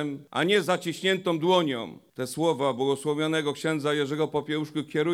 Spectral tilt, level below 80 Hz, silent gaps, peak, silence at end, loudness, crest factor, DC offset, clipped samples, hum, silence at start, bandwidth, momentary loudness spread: -5 dB/octave; -72 dBFS; none; -10 dBFS; 0 s; -26 LUFS; 16 dB; under 0.1%; under 0.1%; none; 0 s; 16 kHz; 7 LU